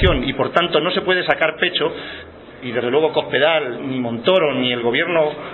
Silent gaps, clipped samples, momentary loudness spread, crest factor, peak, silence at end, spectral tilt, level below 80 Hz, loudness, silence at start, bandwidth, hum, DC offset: none; under 0.1%; 8 LU; 18 dB; 0 dBFS; 0 s; -2.5 dB/octave; -36 dBFS; -18 LUFS; 0 s; 4.3 kHz; none; under 0.1%